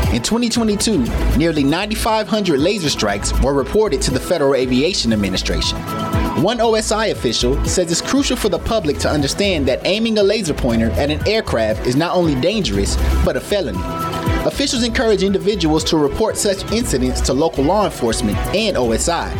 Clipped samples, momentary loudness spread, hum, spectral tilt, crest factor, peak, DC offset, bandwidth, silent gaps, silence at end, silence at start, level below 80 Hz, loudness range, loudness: under 0.1%; 3 LU; none; -4.5 dB/octave; 10 dB; -6 dBFS; under 0.1%; 17 kHz; none; 0 s; 0 s; -26 dBFS; 1 LU; -17 LUFS